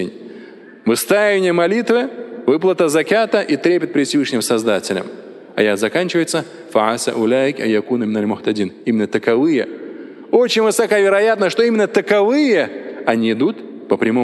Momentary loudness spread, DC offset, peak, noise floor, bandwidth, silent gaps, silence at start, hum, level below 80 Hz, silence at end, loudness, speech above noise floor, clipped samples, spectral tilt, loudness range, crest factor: 10 LU; under 0.1%; 0 dBFS; -38 dBFS; 12.5 kHz; none; 0 s; none; -66 dBFS; 0 s; -16 LUFS; 23 dB; under 0.1%; -4.5 dB/octave; 3 LU; 16 dB